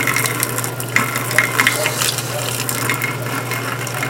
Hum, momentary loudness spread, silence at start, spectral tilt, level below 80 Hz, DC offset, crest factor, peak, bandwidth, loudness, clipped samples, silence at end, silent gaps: none; 7 LU; 0 s; -2.5 dB/octave; -54 dBFS; under 0.1%; 20 dB; 0 dBFS; 17.5 kHz; -18 LUFS; under 0.1%; 0 s; none